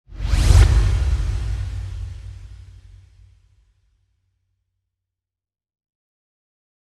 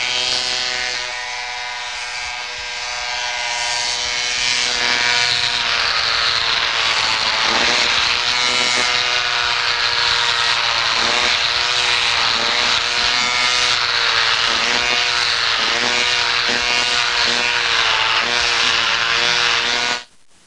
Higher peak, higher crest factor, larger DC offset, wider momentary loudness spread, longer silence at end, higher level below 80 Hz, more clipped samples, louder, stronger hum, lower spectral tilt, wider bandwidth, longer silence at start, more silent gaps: first, 0 dBFS vs -4 dBFS; first, 22 dB vs 14 dB; second, under 0.1% vs 0.3%; first, 24 LU vs 8 LU; first, 4.3 s vs 0.4 s; first, -24 dBFS vs -48 dBFS; neither; second, -20 LUFS vs -15 LUFS; neither; first, -5.5 dB/octave vs 0.5 dB/octave; about the same, 12 kHz vs 12 kHz; about the same, 0.1 s vs 0 s; neither